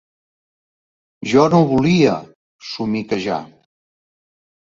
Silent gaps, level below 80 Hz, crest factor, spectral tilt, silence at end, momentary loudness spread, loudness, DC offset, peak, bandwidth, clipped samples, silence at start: 2.35-2.59 s; -52 dBFS; 18 dB; -6.5 dB/octave; 1.2 s; 16 LU; -17 LUFS; under 0.1%; 0 dBFS; 7.6 kHz; under 0.1%; 1.2 s